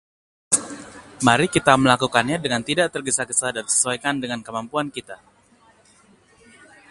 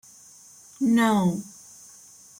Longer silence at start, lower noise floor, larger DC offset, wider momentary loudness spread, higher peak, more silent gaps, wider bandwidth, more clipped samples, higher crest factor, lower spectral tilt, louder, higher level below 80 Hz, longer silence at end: second, 0.5 s vs 0.8 s; first, -56 dBFS vs -50 dBFS; neither; second, 15 LU vs 25 LU; first, 0 dBFS vs -8 dBFS; neither; second, 11.5 kHz vs 16 kHz; neither; about the same, 22 dB vs 18 dB; second, -3 dB/octave vs -5.5 dB/octave; first, -20 LUFS vs -23 LUFS; first, -54 dBFS vs -66 dBFS; first, 1.75 s vs 0.9 s